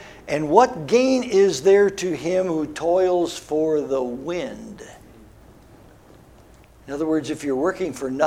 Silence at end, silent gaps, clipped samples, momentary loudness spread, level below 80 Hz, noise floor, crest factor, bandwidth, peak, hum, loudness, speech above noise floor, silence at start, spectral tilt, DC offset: 0 s; none; under 0.1%; 12 LU; -54 dBFS; -49 dBFS; 22 dB; 14 kHz; 0 dBFS; none; -21 LUFS; 29 dB; 0 s; -5 dB/octave; under 0.1%